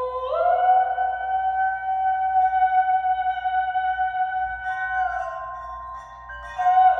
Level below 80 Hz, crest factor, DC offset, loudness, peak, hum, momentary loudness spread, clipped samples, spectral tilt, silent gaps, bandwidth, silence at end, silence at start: -50 dBFS; 14 dB; under 0.1%; -22 LUFS; -8 dBFS; 60 Hz at -65 dBFS; 15 LU; under 0.1%; -3.5 dB/octave; none; 6 kHz; 0 s; 0 s